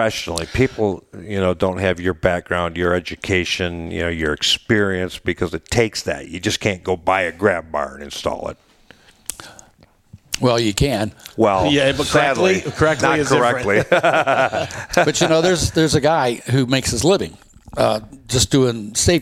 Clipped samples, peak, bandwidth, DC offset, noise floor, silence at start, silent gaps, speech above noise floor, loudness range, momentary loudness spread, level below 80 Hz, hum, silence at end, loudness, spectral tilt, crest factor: under 0.1%; 0 dBFS; 16.5 kHz; under 0.1%; -52 dBFS; 0 s; none; 34 dB; 7 LU; 10 LU; -40 dBFS; none; 0 s; -18 LUFS; -4 dB/octave; 18 dB